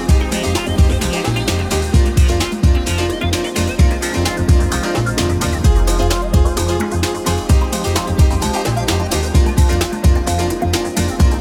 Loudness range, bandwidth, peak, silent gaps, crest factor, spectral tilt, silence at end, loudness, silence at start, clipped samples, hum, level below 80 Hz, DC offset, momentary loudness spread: 1 LU; 17 kHz; -2 dBFS; none; 12 dB; -5 dB/octave; 0 s; -16 LUFS; 0 s; under 0.1%; none; -18 dBFS; under 0.1%; 3 LU